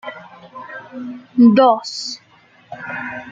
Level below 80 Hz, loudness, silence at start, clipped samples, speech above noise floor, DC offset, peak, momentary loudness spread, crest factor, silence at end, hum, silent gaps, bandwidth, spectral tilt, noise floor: -66 dBFS; -16 LUFS; 0.05 s; under 0.1%; 35 dB; under 0.1%; -2 dBFS; 26 LU; 18 dB; 0 s; none; none; 7.8 kHz; -5.5 dB/octave; -51 dBFS